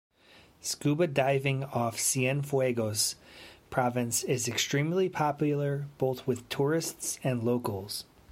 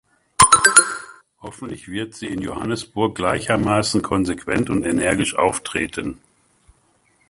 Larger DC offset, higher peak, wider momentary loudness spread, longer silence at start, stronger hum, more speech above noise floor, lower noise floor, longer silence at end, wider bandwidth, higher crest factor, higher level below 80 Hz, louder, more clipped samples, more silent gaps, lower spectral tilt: neither; second, -12 dBFS vs 0 dBFS; second, 8 LU vs 20 LU; first, 0.65 s vs 0.4 s; neither; second, 29 dB vs 39 dB; about the same, -58 dBFS vs -61 dBFS; second, 0.3 s vs 1.15 s; about the same, 16.5 kHz vs 16 kHz; about the same, 18 dB vs 20 dB; second, -66 dBFS vs -44 dBFS; second, -30 LUFS vs -18 LUFS; neither; neither; first, -4.5 dB/octave vs -3 dB/octave